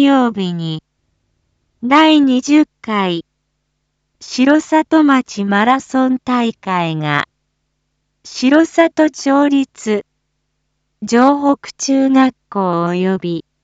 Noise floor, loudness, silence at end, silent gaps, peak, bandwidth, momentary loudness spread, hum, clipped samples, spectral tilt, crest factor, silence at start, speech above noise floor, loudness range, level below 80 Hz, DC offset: -69 dBFS; -14 LUFS; 0.25 s; none; 0 dBFS; 8 kHz; 10 LU; none; under 0.1%; -5 dB/octave; 14 dB; 0 s; 56 dB; 2 LU; -60 dBFS; under 0.1%